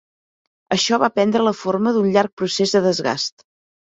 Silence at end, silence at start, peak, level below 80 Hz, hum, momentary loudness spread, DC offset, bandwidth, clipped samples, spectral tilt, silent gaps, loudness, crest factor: 0.65 s; 0.7 s; -2 dBFS; -62 dBFS; none; 6 LU; under 0.1%; 8 kHz; under 0.1%; -4.5 dB/octave; 2.33-2.37 s; -19 LUFS; 18 dB